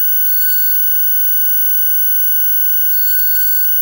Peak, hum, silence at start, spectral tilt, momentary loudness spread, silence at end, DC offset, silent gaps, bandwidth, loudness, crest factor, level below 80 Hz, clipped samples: -4 dBFS; 50 Hz at -65 dBFS; 0 s; 3.5 dB/octave; 0 LU; 0 s; under 0.1%; none; 16.5 kHz; -9 LUFS; 8 dB; -52 dBFS; under 0.1%